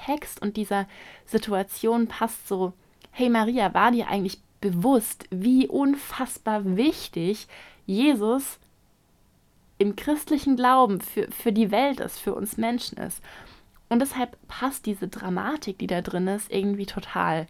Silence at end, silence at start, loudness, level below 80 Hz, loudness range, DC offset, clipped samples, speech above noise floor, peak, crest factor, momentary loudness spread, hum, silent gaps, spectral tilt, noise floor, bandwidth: 0.05 s; 0 s; -25 LUFS; -56 dBFS; 5 LU; under 0.1%; under 0.1%; 37 dB; -6 dBFS; 20 dB; 11 LU; none; none; -5 dB/octave; -62 dBFS; 16 kHz